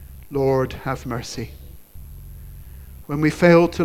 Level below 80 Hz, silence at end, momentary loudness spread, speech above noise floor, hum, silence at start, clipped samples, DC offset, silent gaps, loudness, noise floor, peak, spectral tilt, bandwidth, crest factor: -40 dBFS; 0 s; 27 LU; 20 dB; none; 0 s; under 0.1%; under 0.1%; none; -20 LUFS; -39 dBFS; 0 dBFS; -7 dB/octave; 15.5 kHz; 20 dB